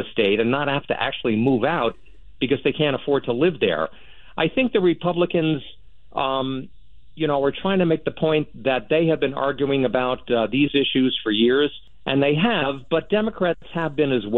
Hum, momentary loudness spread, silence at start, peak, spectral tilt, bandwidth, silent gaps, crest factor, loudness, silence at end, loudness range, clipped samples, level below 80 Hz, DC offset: none; 7 LU; 0 s; -6 dBFS; -9 dB/octave; 4.3 kHz; none; 14 dB; -21 LUFS; 0 s; 3 LU; under 0.1%; -52 dBFS; 0.8%